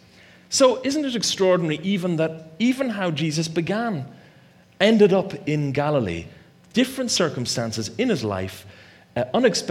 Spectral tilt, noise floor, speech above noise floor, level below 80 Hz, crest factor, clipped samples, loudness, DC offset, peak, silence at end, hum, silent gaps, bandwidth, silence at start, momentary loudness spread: -4.5 dB/octave; -52 dBFS; 31 dB; -58 dBFS; 20 dB; under 0.1%; -22 LUFS; under 0.1%; -2 dBFS; 0 s; none; none; 16 kHz; 0.5 s; 10 LU